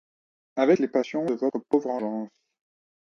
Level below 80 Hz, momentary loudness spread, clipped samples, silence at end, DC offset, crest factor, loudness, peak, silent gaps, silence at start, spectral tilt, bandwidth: -74 dBFS; 13 LU; under 0.1%; 0.75 s; under 0.1%; 18 dB; -26 LUFS; -8 dBFS; none; 0.55 s; -7 dB/octave; 7.2 kHz